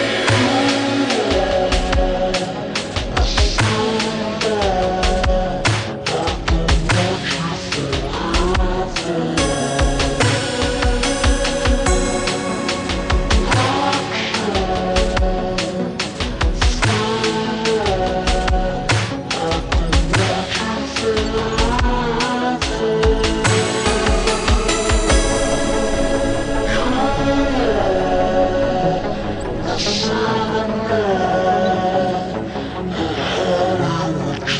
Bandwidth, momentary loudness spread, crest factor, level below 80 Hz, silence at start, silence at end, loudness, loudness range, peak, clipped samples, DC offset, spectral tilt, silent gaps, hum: 10 kHz; 5 LU; 14 dB; -24 dBFS; 0 s; 0 s; -18 LUFS; 2 LU; -4 dBFS; under 0.1%; under 0.1%; -4.5 dB/octave; none; none